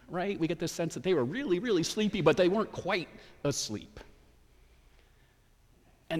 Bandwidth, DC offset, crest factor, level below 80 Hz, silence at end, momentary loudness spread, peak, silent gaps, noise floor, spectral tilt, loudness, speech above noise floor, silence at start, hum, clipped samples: 15.5 kHz; under 0.1%; 20 dB; -60 dBFS; 0 s; 10 LU; -12 dBFS; none; -64 dBFS; -5 dB/octave; -30 LUFS; 33 dB; 0.1 s; none; under 0.1%